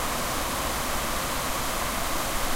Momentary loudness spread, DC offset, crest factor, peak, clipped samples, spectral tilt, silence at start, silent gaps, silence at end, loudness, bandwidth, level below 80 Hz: 0 LU; under 0.1%; 14 dB; -14 dBFS; under 0.1%; -2.5 dB/octave; 0 s; none; 0 s; -27 LUFS; 16 kHz; -36 dBFS